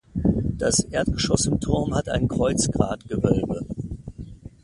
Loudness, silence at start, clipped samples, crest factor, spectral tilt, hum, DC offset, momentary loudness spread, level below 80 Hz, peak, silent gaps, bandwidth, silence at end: -23 LUFS; 0.15 s; under 0.1%; 22 dB; -5 dB/octave; none; under 0.1%; 13 LU; -36 dBFS; -2 dBFS; none; 11.5 kHz; 0.15 s